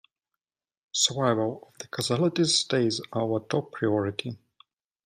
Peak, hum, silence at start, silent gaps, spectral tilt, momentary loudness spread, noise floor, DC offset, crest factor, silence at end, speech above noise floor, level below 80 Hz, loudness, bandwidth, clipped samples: -10 dBFS; none; 0.95 s; none; -4 dB/octave; 13 LU; -88 dBFS; under 0.1%; 18 dB; 0.7 s; 61 dB; -70 dBFS; -26 LUFS; 15.5 kHz; under 0.1%